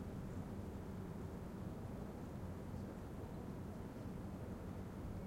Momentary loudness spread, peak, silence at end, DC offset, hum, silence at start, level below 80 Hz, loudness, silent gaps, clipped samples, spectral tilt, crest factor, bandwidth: 1 LU; -36 dBFS; 0 s; under 0.1%; none; 0 s; -58 dBFS; -49 LUFS; none; under 0.1%; -8 dB/octave; 12 dB; 16.5 kHz